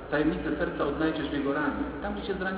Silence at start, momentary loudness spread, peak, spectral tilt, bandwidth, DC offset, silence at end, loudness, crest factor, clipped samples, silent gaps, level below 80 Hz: 0 s; 5 LU; -14 dBFS; -4.5 dB/octave; 4 kHz; under 0.1%; 0 s; -30 LUFS; 16 dB; under 0.1%; none; -46 dBFS